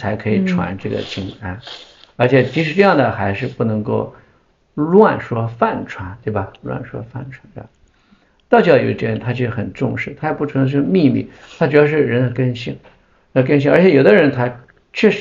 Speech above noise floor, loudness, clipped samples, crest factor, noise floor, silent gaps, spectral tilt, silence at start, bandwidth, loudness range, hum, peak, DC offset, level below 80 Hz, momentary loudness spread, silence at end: 40 dB; -16 LUFS; under 0.1%; 16 dB; -56 dBFS; none; -8 dB/octave; 0 s; 7.4 kHz; 4 LU; none; 0 dBFS; under 0.1%; -50 dBFS; 17 LU; 0 s